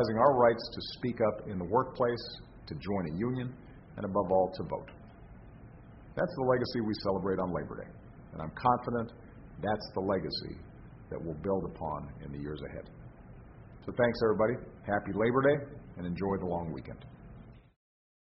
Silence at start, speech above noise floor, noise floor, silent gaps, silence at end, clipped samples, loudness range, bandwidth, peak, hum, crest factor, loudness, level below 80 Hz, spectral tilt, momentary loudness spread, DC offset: 0 s; 20 dB; -52 dBFS; none; 0.6 s; under 0.1%; 5 LU; 5.8 kHz; -10 dBFS; none; 22 dB; -32 LUFS; -54 dBFS; -5.5 dB/octave; 24 LU; under 0.1%